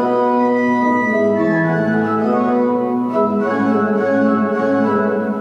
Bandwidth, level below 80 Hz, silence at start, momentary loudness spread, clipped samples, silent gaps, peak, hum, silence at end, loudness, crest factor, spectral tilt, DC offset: 7.2 kHz; -66 dBFS; 0 s; 2 LU; under 0.1%; none; -4 dBFS; none; 0 s; -16 LUFS; 12 dB; -8.5 dB/octave; under 0.1%